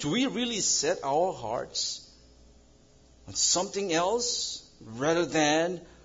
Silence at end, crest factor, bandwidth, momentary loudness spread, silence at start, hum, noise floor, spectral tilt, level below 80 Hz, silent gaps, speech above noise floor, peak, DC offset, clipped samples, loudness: 0.2 s; 20 dB; 8 kHz; 10 LU; 0 s; none; -58 dBFS; -2.5 dB/octave; -60 dBFS; none; 30 dB; -10 dBFS; under 0.1%; under 0.1%; -27 LUFS